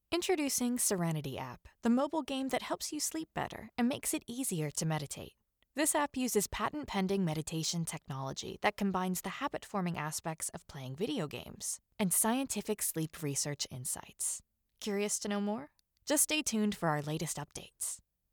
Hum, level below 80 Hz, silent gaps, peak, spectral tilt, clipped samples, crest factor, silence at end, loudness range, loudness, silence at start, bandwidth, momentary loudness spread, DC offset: none; -64 dBFS; none; -16 dBFS; -3.5 dB/octave; under 0.1%; 20 dB; 0.35 s; 3 LU; -35 LUFS; 0.1 s; over 20 kHz; 10 LU; under 0.1%